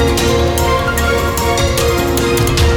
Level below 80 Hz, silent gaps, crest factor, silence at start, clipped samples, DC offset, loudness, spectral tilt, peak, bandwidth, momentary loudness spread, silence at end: -20 dBFS; none; 12 dB; 0 s; under 0.1%; under 0.1%; -14 LUFS; -4.5 dB/octave; -2 dBFS; over 20 kHz; 2 LU; 0 s